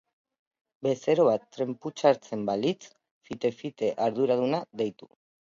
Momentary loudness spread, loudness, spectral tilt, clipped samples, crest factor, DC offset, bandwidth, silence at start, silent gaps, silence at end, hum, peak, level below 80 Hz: 10 LU; -28 LUFS; -6 dB/octave; under 0.1%; 20 dB; under 0.1%; 7.6 kHz; 0.8 s; 3.11-3.21 s; 0.65 s; none; -8 dBFS; -74 dBFS